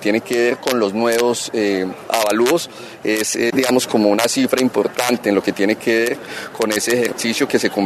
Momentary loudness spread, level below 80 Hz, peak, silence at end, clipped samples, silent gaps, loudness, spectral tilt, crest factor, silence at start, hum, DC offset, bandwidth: 5 LU; -62 dBFS; 0 dBFS; 0 s; under 0.1%; none; -17 LUFS; -3.5 dB/octave; 16 dB; 0 s; none; under 0.1%; 14 kHz